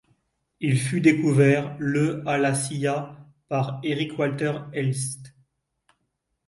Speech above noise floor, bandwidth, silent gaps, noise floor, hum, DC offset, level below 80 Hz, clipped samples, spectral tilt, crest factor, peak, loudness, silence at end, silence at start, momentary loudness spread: 54 dB; 11.5 kHz; none; -77 dBFS; none; under 0.1%; -64 dBFS; under 0.1%; -6 dB/octave; 20 dB; -6 dBFS; -24 LUFS; 1.2 s; 0.6 s; 11 LU